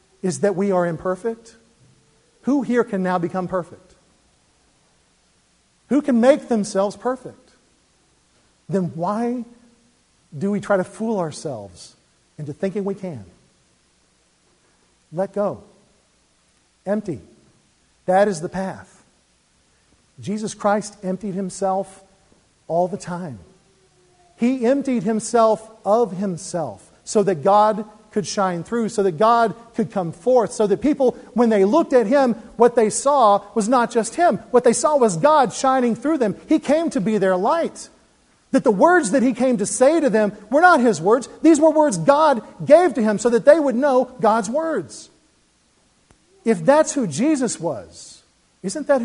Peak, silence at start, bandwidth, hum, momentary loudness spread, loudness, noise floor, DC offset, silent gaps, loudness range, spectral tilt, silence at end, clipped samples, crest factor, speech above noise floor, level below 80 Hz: 0 dBFS; 0.25 s; 11 kHz; none; 15 LU; -19 LUFS; -61 dBFS; under 0.1%; none; 13 LU; -5.5 dB/octave; 0 s; under 0.1%; 20 dB; 42 dB; -60 dBFS